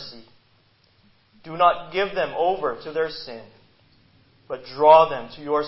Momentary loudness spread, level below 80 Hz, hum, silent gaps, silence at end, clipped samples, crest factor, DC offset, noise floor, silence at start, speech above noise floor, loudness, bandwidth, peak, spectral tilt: 23 LU; -58 dBFS; none; none; 0 s; under 0.1%; 22 dB; under 0.1%; -60 dBFS; 0 s; 40 dB; -20 LUFS; 5.8 kHz; -2 dBFS; -8.5 dB/octave